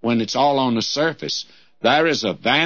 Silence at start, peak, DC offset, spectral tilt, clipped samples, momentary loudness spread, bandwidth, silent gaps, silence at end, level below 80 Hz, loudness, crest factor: 0 s; -4 dBFS; 0.2%; -4 dB/octave; under 0.1%; 9 LU; 7.2 kHz; none; 0 s; -64 dBFS; -19 LUFS; 16 dB